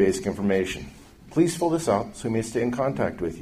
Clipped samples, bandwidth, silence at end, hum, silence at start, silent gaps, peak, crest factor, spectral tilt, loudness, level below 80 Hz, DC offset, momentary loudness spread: under 0.1%; 15.5 kHz; 0 s; none; 0 s; none; -8 dBFS; 18 dB; -5.5 dB/octave; -25 LUFS; -50 dBFS; under 0.1%; 7 LU